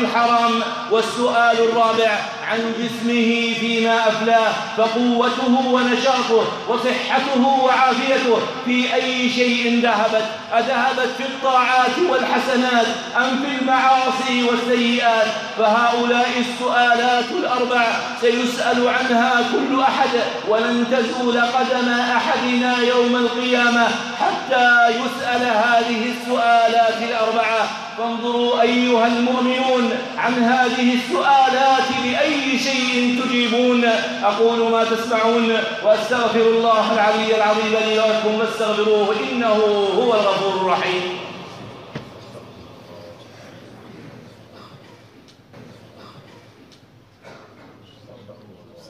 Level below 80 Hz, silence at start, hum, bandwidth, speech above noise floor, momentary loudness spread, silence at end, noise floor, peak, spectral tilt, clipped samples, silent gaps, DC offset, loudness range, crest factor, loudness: -68 dBFS; 0 s; none; 13 kHz; 32 dB; 6 LU; 0.1 s; -49 dBFS; -4 dBFS; -3.5 dB/octave; under 0.1%; none; under 0.1%; 1 LU; 14 dB; -17 LUFS